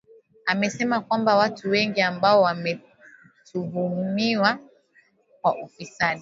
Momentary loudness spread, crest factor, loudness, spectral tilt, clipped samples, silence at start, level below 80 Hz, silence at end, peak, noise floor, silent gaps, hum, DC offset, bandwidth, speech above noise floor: 13 LU; 20 dB; -23 LUFS; -5 dB/octave; under 0.1%; 0.45 s; -68 dBFS; 0 s; -4 dBFS; -61 dBFS; none; none; under 0.1%; 7.8 kHz; 39 dB